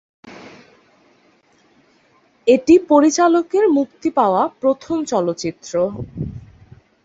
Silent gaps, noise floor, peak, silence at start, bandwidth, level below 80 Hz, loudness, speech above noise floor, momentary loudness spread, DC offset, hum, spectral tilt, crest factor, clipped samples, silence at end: none; -57 dBFS; -2 dBFS; 0.25 s; 8 kHz; -50 dBFS; -17 LUFS; 40 dB; 16 LU; under 0.1%; none; -5.5 dB/octave; 18 dB; under 0.1%; 0.65 s